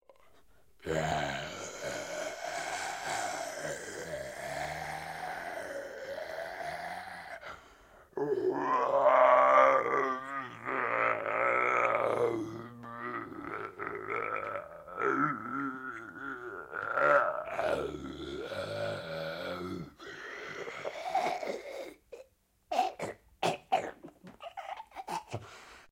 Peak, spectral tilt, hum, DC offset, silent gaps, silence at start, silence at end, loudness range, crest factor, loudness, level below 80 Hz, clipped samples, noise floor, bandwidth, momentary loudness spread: -10 dBFS; -4 dB/octave; none; under 0.1%; none; 0.8 s; 0.1 s; 12 LU; 24 dB; -33 LUFS; -64 dBFS; under 0.1%; -66 dBFS; 16 kHz; 18 LU